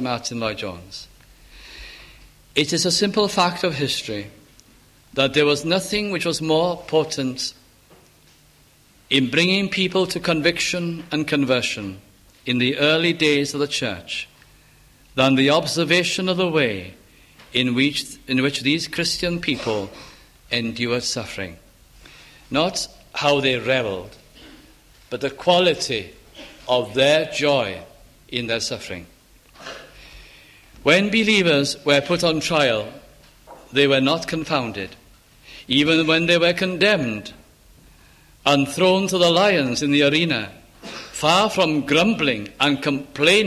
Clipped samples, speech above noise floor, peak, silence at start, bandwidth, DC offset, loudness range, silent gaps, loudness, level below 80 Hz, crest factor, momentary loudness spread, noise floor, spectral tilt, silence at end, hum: under 0.1%; 34 dB; -2 dBFS; 0 s; 15.5 kHz; under 0.1%; 5 LU; none; -20 LUFS; -52 dBFS; 20 dB; 16 LU; -54 dBFS; -4 dB/octave; 0 s; none